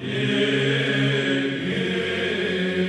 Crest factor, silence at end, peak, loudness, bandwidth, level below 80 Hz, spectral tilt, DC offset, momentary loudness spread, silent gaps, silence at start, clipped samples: 14 dB; 0 s; -8 dBFS; -22 LUFS; 10.5 kHz; -60 dBFS; -5.5 dB/octave; under 0.1%; 3 LU; none; 0 s; under 0.1%